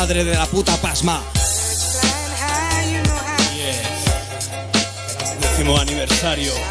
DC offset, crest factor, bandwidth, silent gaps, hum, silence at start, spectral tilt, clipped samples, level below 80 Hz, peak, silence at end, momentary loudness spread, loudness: under 0.1%; 16 dB; 11 kHz; none; none; 0 s; -3 dB/octave; under 0.1%; -28 dBFS; -2 dBFS; 0 s; 4 LU; -18 LUFS